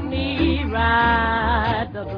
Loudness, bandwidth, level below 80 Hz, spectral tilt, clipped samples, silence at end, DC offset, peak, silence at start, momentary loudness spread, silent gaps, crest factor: -20 LUFS; 5.2 kHz; -30 dBFS; -8.5 dB/octave; under 0.1%; 0 s; under 0.1%; -6 dBFS; 0 s; 6 LU; none; 14 dB